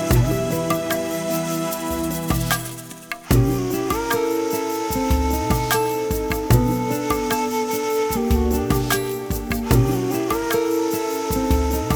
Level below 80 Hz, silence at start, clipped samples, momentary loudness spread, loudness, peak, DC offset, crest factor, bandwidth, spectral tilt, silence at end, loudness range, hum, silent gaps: -30 dBFS; 0 s; under 0.1%; 6 LU; -21 LUFS; -2 dBFS; under 0.1%; 18 dB; over 20 kHz; -5.5 dB/octave; 0 s; 2 LU; none; none